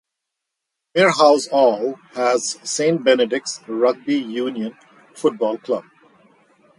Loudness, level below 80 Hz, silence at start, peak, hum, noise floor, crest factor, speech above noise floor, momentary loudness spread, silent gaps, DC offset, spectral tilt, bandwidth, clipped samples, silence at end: -19 LUFS; -72 dBFS; 0.95 s; -2 dBFS; none; -81 dBFS; 18 dB; 63 dB; 11 LU; none; under 0.1%; -3.5 dB/octave; 11.5 kHz; under 0.1%; 0.95 s